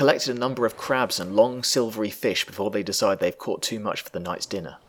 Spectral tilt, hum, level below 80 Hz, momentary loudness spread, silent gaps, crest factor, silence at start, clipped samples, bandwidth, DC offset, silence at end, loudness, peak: -3.5 dB/octave; none; -64 dBFS; 9 LU; none; 22 dB; 0 s; under 0.1%; over 20 kHz; under 0.1%; 0.1 s; -25 LUFS; -2 dBFS